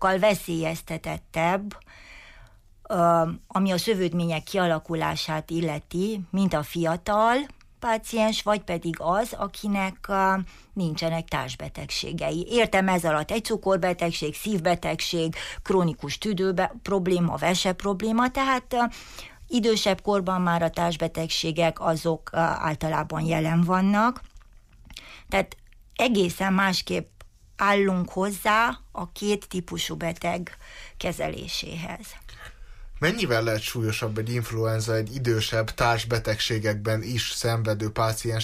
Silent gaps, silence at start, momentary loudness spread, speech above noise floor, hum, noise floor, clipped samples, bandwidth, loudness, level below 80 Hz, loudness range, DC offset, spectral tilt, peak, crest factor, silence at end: none; 0 s; 11 LU; 26 dB; none; -51 dBFS; under 0.1%; 15.5 kHz; -25 LUFS; -46 dBFS; 3 LU; under 0.1%; -5 dB/octave; -10 dBFS; 16 dB; 0 s